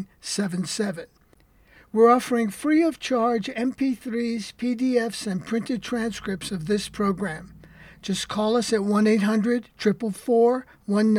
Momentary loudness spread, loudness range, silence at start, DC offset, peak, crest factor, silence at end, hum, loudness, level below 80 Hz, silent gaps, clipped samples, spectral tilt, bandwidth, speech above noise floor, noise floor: 10 LU; 4 LU; 0 s; under 0.1%; -6 dBFS; 18 dB; 0 s; none; -24 LUFS; -56 dBFS; none; under 0.1%; -5 dB/octave; 16 kHz; 35 dB; -58 dBFS